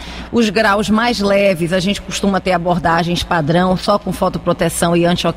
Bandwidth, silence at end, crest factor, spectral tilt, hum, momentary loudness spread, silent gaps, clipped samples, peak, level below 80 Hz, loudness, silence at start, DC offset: 16 kHz; 0 s; 14 dB; -5 dB/octave; none; 4 LU; none; under 0.1%; -2 dBFS; -36 dBFS; -15 LUFS; 0 s; under 0.1%